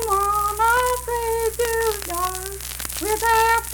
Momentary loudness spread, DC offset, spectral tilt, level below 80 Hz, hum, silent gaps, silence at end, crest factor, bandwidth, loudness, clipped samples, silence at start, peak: 9 LU; under 0.1%; -2 dB/octave; -38 dBFS; none; none; 0 s; 18 dB; 19.5 kHz; -21 LUFS; under 0.1%; 0 s; -2 dBFS